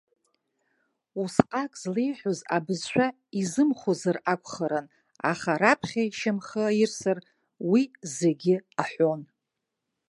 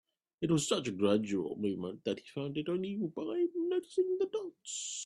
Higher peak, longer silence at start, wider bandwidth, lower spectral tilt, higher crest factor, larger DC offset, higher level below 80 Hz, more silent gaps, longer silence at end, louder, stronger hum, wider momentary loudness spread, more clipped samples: first, 0 dBFS vs -16 dBFS; first, 1.15 s vs 0.4 s; about the same, 11.5 kHz vs 12 kHz; about the same, -5.5 dB/octave vs -5 dB/octave; first, 28 dB vs 18 dB; neither; first, -66 dBFS vs -74 dBFS; neither; first, 0.85 s vs 0 s; first, -27 LUFS vs -35 LUFS; neither; about the same, 8 LU vs 8 LU; neither